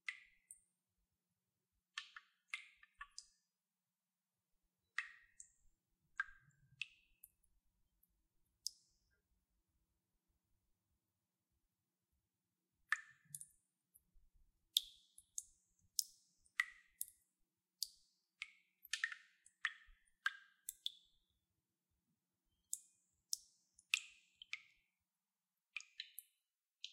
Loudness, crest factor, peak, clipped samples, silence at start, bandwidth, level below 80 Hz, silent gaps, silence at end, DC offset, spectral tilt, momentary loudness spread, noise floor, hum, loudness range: -47 LUFS; 42 dB; -10 dBFS; under 0.1%; 0.1 s; 13.5 kHz; -84 dBFS; none; 0 s; under 0.1%; 4 dB/octave; 21 LU; under -90 dBFS; none; 11 LU